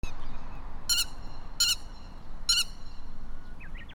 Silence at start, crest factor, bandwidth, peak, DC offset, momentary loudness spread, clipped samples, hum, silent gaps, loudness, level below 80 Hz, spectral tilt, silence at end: 0.05 s; 18 dB; 19.5 kHz; -12 dBFS; under 0.1%; 23 LU; under 0.1%; none; none; -28 LUFS; -38 dBFS; 0 dB/octave; 0.05 s